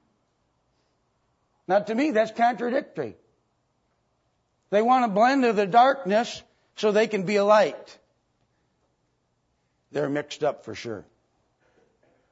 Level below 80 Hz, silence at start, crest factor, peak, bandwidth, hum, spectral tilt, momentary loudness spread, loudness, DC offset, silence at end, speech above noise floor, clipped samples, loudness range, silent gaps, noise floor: -74 dBFS; 1.7 s; 20 dB; -6 dBFS; 8 kHz; none; -5.5 dB/octave; 16 LU; -23 LUFS; under 0.1%; 1.3 s; 50 dB; under 0.1%; 12 LU; none; -72 dBFS